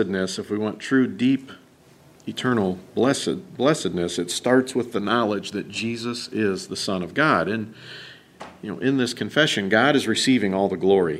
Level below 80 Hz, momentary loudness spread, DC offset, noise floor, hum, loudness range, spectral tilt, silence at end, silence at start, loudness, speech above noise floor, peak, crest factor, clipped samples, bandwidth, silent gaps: -62 dBFS; 14 LU; under 0.1%; -52 dBFS; none; 3 LU; -4.5 dB/octave; 0 s; 0 s; -22 LUFS; 30 dB; -4 dBFS; 20 dB; under 0.1%; 14 kHz; none